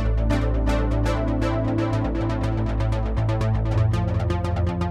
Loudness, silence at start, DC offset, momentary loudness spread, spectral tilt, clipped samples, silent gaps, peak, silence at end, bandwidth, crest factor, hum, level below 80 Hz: -23 LUFS; 0 s; under 0.1%; 3 LU; -8 dB/octave; under 0.1%; none; -10 dBFS; 0 s; 9.4 kHz; 12 dB; none; -26 dBFS